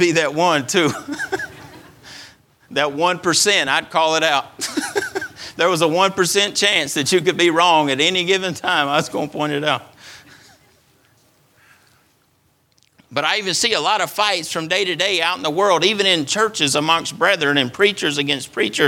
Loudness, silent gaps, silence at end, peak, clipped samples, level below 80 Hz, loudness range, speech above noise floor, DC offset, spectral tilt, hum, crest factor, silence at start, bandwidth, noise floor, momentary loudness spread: -17 LUFS; none; 0 s; 0 dBFS; under 0.1%; -62 dBFS; 8 LU; 43 dB; under 0.1%; -2.5 dB/octave; none; 18 dB; 0 s; 18 kHz; -61 dBFS; 10 LU